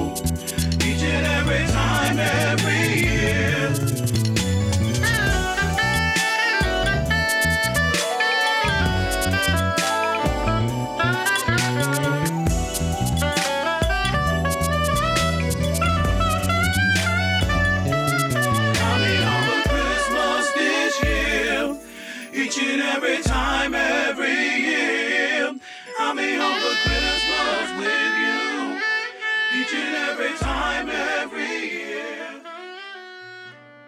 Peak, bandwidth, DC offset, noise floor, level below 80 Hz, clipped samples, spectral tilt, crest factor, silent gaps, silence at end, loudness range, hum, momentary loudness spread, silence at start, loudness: -6 dBFS; 16.5 kHz; under 0.1%; -42 dBFS; -32 dBFS; under 0.1%; -4 dB/octave; 14 dB; none; 0.05 s; 2 LU; none; 6 LU; 0 s; -21 LUFS